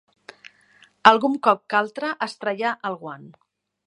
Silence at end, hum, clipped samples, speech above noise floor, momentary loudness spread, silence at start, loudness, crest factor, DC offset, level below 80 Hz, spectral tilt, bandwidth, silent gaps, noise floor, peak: 0.55 s; none; under 0.1%; 35 dB; 17 LU; 1.05 s; -21 LUFS; 24 dB; under 0.1%; -72 dBFS; -4.5 dB/octave; 11 kHz; none; -57 dBFS; 0 dBFS